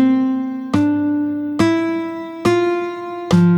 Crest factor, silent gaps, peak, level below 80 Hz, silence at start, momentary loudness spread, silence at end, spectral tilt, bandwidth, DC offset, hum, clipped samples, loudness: 14 dB; none; -2 dBFS; -52 dBFS; 0 s; 8 LU; 0 s; -7.5 dB/octave; 11.5 kHz; under 0.1%; none; under 0.1%; -18 LUFS